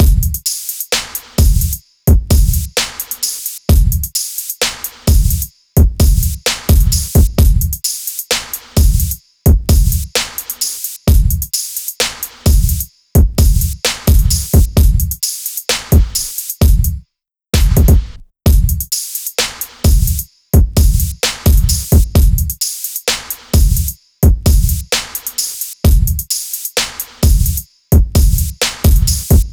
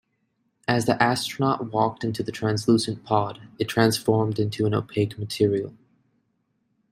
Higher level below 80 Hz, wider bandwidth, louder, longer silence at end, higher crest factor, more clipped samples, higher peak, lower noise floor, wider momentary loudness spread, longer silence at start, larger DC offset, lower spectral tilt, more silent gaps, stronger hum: first, -14 dBFS vs -60 dBFS; first, over 20 kHz vs 16 kHz; first, -14 LUFS vs -24 LUFS; second, 0 s vs 1.2 s; second, 12 dB vs 22 dB; neither; first, 0 dBFS vs -4 dBFS; second, -67 dBFS vs -72 dBFS; about the same, 6 LU vs 8 LU; second, 0 s vs 0.7 s; neither; second, -4 dB/octave vs -5.5 dB/octave; neither; neither